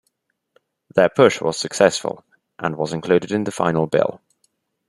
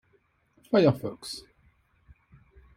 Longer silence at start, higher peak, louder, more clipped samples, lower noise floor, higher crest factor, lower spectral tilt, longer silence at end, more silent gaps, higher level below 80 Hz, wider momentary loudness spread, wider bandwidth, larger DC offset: first, 0.95 s vs 0.7 s; first, -2 dBFS vs -8 dBFS; first, -19 LUFS vs -26 LUFS; neither; about the same, -71 dBFS vs -68 dBFS; about the same, 20 dB vs 22 dB; second, -5 dB/octave vs -6.5 dB/octave; second, 0.7 s vs 1.35 s; neither; about the same, -60 dBFS vs -62 dBFS; second, 11 LU vs 17 LU; second, 12.5 kHz vs 16 kHz; neither